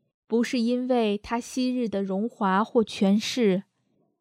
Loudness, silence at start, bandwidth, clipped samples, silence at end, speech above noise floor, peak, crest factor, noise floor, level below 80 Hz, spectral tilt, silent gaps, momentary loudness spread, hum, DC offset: -25 LUFS; 0.3 s; 14.5 kHz; under 0.1%; 0.6 s; 46 dB; -10 dBFS; 16 dB; -70 dBFS; -62 dBFS; -5.5 dB/octave; none; 6 LU; none; under 0.1%